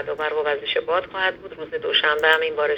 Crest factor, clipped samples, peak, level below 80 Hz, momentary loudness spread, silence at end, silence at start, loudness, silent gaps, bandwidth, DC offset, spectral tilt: 20 dB; under 0.1%; -2 dBFS; -60 dBFS; 10 LU; 0 s; 0 s; -21 LUFS; none; 18.5 kHz; under 0.1%; -3 dB/octave